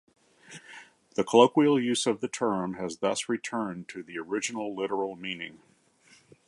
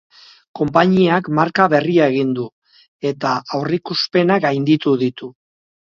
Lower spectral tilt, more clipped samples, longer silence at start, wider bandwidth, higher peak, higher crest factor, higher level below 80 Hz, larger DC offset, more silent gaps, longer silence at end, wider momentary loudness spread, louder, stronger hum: second, -4 dB/octave vs -7 dB/octave; neither; about the same, 0.5 s vs 0.55 s; first, 11.5 kHz vs 7.2 kHz; second, -4 dBFS vs 0 dBFS; first, 24 dB vs 18 dB; second, -72 dBFS vs -58 dBFS; neither; second, none vs 2.52-2.62 s, 2.88-3.00 s; first, 0.95 s vs 0.55 s; first, 23 LU vs 11 LU; second, -28 LUFS vs -17 LUFS; neither